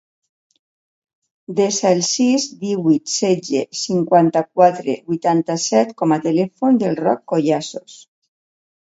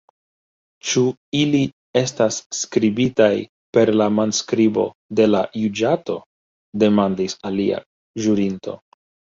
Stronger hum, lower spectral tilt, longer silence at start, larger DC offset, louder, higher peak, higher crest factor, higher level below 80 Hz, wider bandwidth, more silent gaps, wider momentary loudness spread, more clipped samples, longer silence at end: neither; about the same, -4.5 dB/octave vs -5 dB/octave; first, 1.5 s vs 0.85 s; neither; about the same, -17 LUFS vs -19 LUFS; about the same, 0 dBFS vs -2 dBFS; about the same, 18 dB vs 18 dB; second, -66 dBFS vs -58 dBFS; about the same, 8 kHz vs 7.8 kHz; second, none vs 1.17-1.32 s, 1.73-1.94 s, 2.46-2.50 s, 3.49-3.73 s, 4.95-5.09 s, 6.26-6.73 s, 7.86-8.14 s; second, 8 LU vs 12 LU; neither; first, 0.95 s vs 0.6 s